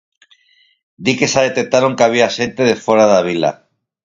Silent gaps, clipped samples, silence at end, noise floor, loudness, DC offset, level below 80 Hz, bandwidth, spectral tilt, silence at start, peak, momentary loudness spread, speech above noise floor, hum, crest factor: none; under 0.1%; 0.5 s; -55 dBFS; -14 LUFS; under 0.1%; -56 dBFS; 7.8 kHz; -4 dB/octave; 1 s; 0 dBFS; 7 LU; 41 dB; none; 16 dB